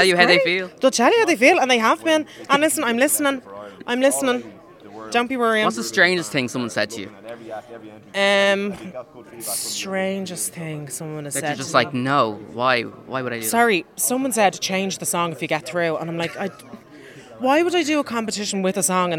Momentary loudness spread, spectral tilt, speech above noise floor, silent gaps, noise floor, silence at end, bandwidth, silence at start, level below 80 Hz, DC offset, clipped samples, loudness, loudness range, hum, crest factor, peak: 14 LU; -3 dB/octave; 22 dB; none; -43 dBFS; 0 s; 17.5 kHz; 0 s; -66 dBFS; under 0.1%; under 0.1%; -20 LUFS; 6 LU; none; 20 dB; 0 dBFS